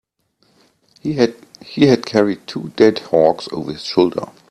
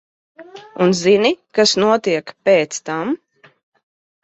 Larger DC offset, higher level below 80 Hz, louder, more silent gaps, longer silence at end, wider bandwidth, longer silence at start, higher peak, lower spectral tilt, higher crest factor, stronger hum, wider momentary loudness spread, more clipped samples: neither; first, -56 dBFS vs -62 dBFS; about the same, -17 LUFS vs -16 LUFS; neither; second, 0.25 s vs 1.1 s; first, 12 kHz vs 8.2 kHz; first, 1.05 s vs 0.4 s; about the same, 0 dBFS vs -2 dBFS; first, -6 dB/octave vs -4 dB/octave; about the same, 18 dB vs 16 dB; neither; first, 13 LU vs 10 LU; neither